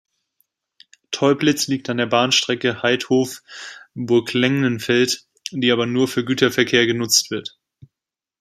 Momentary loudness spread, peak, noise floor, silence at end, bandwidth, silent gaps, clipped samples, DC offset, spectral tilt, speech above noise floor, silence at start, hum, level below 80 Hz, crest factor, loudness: 14 LU; -2 dBFS; -87 dBFS; 0.9 s; 15.5 kHz; none; under 0.1%; under 0.1%; -3.5 dB/octave; 69 dB; 1.1 s; none; -62 dBFS; 20 dB; -18 LUFS